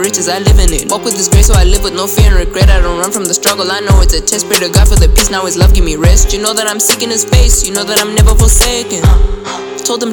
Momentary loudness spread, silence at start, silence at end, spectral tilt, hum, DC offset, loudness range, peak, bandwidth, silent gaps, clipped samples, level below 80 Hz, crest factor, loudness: 5 LU; 0 s; 0 s; -3.5 dB/octave; none; under 0.1%; 1 LU; 0 dBFS; over 20 kHz; none; 0.1%; -10 dBFS; 8 dB; -10 LUFS